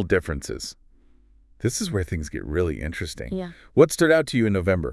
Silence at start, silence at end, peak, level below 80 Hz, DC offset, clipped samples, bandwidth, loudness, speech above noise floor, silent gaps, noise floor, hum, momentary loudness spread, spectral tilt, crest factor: 0 s; 0 s; -2 dBFS; -42 dBFS; under 0.1%; under 0.1%; 12 kHz; -24 LUFS; 32 dB; none; -55 dBFS; none; 13 LU; -5.5 dB/octave; 20 dB